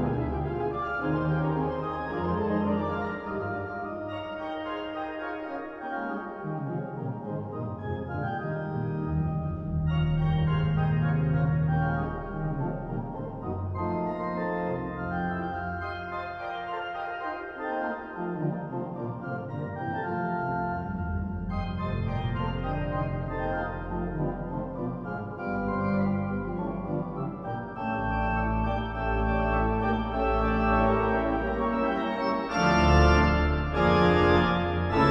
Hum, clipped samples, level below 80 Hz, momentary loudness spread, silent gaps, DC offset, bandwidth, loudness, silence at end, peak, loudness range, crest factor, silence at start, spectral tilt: none; under 0.1%; -38 dBFS; 11 LU; none; under 0.1%; 7 kHz; -29 LUFS; 0 s; -8 dBFS; 9 LU; 20 dB; 0 s; -8 dB/octave